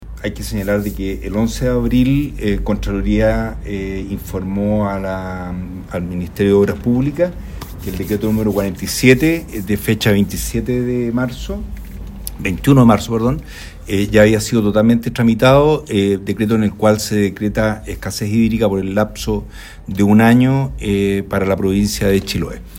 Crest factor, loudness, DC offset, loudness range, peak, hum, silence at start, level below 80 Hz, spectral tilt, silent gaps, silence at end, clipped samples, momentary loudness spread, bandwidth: 16 dB; -16 LUFS; under 0.1%; 5 LU; 0 dBFS; none; 0 s; -30 dBFS; -6 dB/octave; none; 0 s; under 0.1%; 14 LU; 16.5 kHz